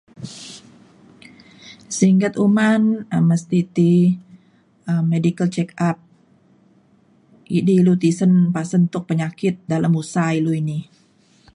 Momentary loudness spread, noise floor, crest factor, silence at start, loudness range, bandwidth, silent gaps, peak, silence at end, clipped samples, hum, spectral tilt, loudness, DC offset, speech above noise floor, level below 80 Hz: 13 LU; -56 dBFS; 16 dB; 0.2 s; 4 LU; 11 kHz; none; -2 dBFS; 0.7 s; under 0.1%; none; -7 dB/octave; -18 LUFS; under 0.1%; 38 dB; -62 dBFS